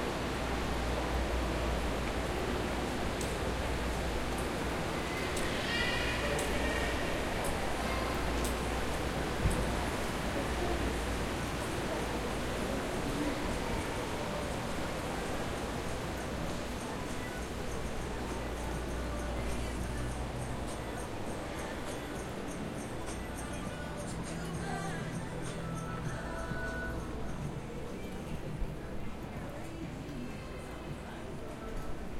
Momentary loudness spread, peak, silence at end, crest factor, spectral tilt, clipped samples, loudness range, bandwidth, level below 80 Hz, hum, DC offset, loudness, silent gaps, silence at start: 9 LU; -18 dBFS; 0 s; 18 dB; -5 dB/octave; under 0.1%; 7 LU; 16.5 kHz; -42 dBFS; none; under 0.1%; -36 LUFS; none; 0 s